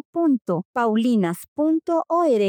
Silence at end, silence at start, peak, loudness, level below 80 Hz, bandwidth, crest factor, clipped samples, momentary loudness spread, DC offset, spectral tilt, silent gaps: 0 s; 0.15 s; -10 dBFS; -22 LUFS; -74 dBFS; 18 kHz; 10 dB; under 0.1%; 5 LU; under 0.1%; -7 dB/octave; 0.65-0.74 s, 1.48-1.56 s